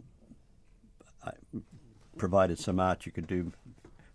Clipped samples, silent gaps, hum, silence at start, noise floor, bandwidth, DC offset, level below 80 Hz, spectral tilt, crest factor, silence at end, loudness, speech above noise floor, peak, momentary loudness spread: under 0.1%; none; none; 0.3 s; -60 dBFS; 11 kHz; under 0.1%; -56 dBFS; -6.5 dB/octave; 22 dB; 0.25 s; -31 LUFS; 30 dB; -14 dBFS; 18 LU